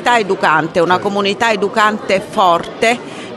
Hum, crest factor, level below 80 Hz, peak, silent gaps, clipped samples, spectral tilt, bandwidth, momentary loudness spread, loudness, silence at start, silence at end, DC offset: none; 14 dB; -52 dBFS; 0 dBFS; none; under 0.1%; -4 dB/octave; 12.5 kHz; 3 LU; -14 LUFS; 0 s; 0 s; under 0.1%